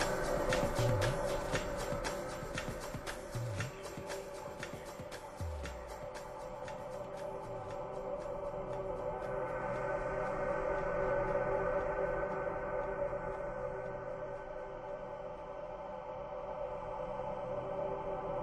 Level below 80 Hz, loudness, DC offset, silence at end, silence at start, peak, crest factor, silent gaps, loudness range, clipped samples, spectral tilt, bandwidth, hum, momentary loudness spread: -50 dBFS; -39 LUFS; under 0.1%; 0 s; 0 s; -18 dBFS; 20 dB; none; 8 LU; under 0.1%; -5 dB/octave; 12.5 kHz; none; 11 LU